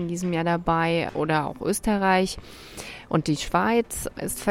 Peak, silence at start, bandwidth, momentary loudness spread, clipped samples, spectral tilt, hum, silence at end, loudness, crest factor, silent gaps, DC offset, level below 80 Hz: -6 dBFS; 0 s; 16.5 kHz; 15 LU; under 0.1%; -5 dB/octave; none; 0 s; -24 LUFS; 18 dB; none; under 0.1%; -44 dBFS